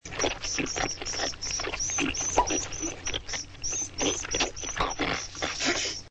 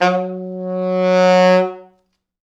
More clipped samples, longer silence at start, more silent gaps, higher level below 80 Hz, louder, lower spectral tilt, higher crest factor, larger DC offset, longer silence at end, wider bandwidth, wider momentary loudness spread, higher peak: neither; about the same, 0.05 s vs 0 s; neither; first, -44 dBFS vs -74 dBFS; second, -29 LUFS vs -16 LUFS; second, -1.5 dB/octave vs -6 dB/octave; about the same, 20 dB vs 16 dB; neither; second, 0 s vs 0.6 s; first, 9 kHz vs 8 kHz; second, 6 LU vs 14 LU; second, -10 dBFS vs 0 dBFS